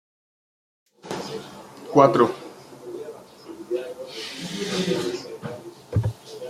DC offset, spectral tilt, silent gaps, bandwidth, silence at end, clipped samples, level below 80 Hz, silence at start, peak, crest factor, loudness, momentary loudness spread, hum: under 0.1%; -6 dB/octave; none; 15.5 kHz; 0 s; under 0.1%; -56 dBFS; 1.05 s; -2 dBFS; 24 dB; -24 LUFS; 24 LU; none